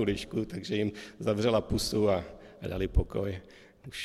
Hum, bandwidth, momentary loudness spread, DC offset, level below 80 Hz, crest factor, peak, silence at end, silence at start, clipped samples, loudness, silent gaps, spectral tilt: none; 15.5 kHz; 15 LU; under 0.1%; -40 dBFS; 18 dB; -14 dBFS; 0 s; 0 s; under 0.1%; -31 LUFS; none; -5.5 dB/octave